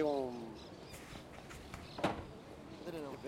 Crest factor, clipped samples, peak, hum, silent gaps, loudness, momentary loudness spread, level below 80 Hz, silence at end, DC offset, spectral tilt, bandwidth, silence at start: 20 dB; under 0.1%; -22 dBFS; none; none; -45 LUFS; 12 LU; -62 dBFS; 0 s; under 0.1%; -5.5 dB/octave; 16 kHz; 0 s